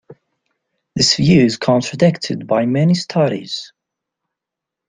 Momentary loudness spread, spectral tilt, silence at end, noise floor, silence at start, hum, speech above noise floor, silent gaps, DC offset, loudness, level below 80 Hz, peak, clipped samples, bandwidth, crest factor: 12 LU; -5.5 dB/octave; 1.25 s; -83 dBFS; 0.1 s; none; 68 dB; none; under 0.1%; -15 LUFS; -50 dBFS; -2 dBFS; under 0.1%; 9.6 kHz; 16 dB